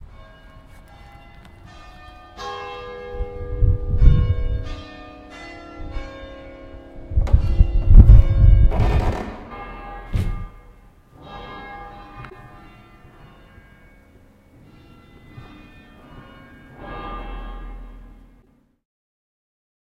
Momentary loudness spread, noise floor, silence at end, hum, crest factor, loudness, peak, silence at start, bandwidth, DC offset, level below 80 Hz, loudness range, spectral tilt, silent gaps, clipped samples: 27 LU; -57 dBFS; 1.95 s; none; 20 dB; -19 LUFS; 0 dBFS; 2.4 s; 5.6 kHz; under 0.1%; -22 dBFS; 23 LU; -8.5 dB/octave; none; under 0.1%